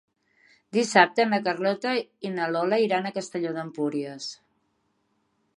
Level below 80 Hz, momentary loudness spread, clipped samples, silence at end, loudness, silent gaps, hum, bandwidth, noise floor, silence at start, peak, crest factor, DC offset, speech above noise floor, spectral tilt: -80 dBFS; 13 LU; under 0.1%; 1.25 s; -25 LUFS; none; none; 11.5 kHz; -72 dBFS; 0.75 s; -4 dBFS; 24 dB; under 0.1%; 47 dB; -4.5 dB/octave